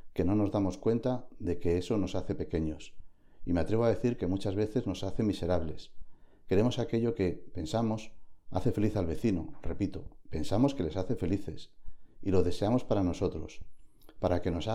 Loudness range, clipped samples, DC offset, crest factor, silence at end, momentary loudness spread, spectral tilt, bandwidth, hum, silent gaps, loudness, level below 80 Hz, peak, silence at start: 2 LU; under 0.1%; under 0.1%; 18 dB; 0 s; 12 LU; -7.5 dB/octave; 14 kHz; none; none; -32 LUFS; -48 dBFS; -12 dBFS; 0.05 s